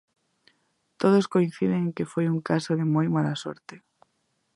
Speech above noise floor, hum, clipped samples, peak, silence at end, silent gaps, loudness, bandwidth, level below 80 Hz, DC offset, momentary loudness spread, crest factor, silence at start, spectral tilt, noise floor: 49 dB; none; under 0.1%; -8 dBFS; 0.8 s; none; -25 LUFS; 11 kHz; -68 dBFS; under 0.1%; 9 LU; 18 dB; 1 s; -7.5 dB/octave; -73 dBFS